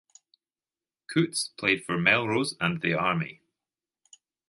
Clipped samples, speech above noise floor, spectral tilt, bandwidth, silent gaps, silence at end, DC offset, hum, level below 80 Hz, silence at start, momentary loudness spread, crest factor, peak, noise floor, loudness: under 0.1%; over 63 dB; -4.5 dB/octave; 11.5 kHz; none; 1.15 s; under 0.1%; none; -64 dBFS; 1.1 s; 7 LU; 22 dB; -6 dBFS; under -90 dBFS; -26 LUFS